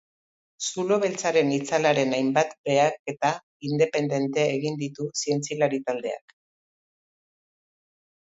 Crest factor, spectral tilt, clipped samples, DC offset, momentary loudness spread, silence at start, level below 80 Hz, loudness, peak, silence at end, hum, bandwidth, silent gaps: 20 dB; -4.5 dB/octave; under 0.1%; under 0.1%; 8 LU; 0.6 s; -72 dBFS; -25 LUFS; -6 dBFS; 2.1 s; none; 8 kHz; 2.58-2.64 s, 2.99-3.05 s, 3.43-3.60 s